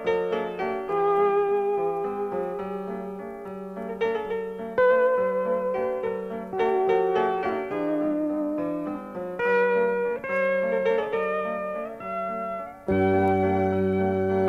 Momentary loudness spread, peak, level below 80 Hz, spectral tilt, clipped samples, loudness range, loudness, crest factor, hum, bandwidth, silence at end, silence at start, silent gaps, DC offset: 11 LU; -12 dBFS; -58 dBFS; -8 dB/octave; under 0.1%; 3 LU; -26 LUFS; 14 dB; none; 6.6 kHz; 0 s; 0 s; none; under 0.1%